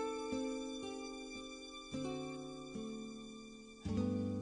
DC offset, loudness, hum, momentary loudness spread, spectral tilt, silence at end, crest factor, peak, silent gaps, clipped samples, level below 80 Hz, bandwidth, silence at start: under 0.1%; -44 LUFS; none; 11 LU; -5.5 dB/octave; 0 s; 16 dB; -26 dBFS; none; under 0.1%; -64 dBFS; 10 kHz; 0 s